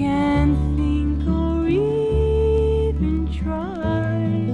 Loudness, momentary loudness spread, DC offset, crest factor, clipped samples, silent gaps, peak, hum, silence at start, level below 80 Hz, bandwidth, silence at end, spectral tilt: -21 LUFS; 5 LU; under 0.1%; 12 dB; under 0.1%; none; -6 dBFS; none; 0 s; -26 dBFS; 9 kHz; 0 s; -9 dB/octave